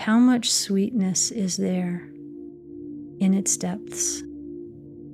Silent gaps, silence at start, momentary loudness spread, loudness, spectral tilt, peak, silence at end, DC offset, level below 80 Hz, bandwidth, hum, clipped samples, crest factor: none; 0 s; 21 LU; -23 LUFS; -4 dB/octave; -10 dBFS; 0 s; under 0.1%; -62 dBFS; 15 kHz; none; under 0.1%; 14 dB